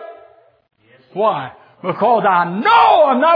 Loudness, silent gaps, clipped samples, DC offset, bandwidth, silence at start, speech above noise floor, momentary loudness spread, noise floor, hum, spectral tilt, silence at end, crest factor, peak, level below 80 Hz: -14 LUFS; none; under 0.1%; under 0.1%; 5.2 kHz; 0 s; 35 dB; 17 LU; -48 dBFS; none; -7.5 dB/octave; 0 s; 14 dB; 0 dBFS; -64 dBFS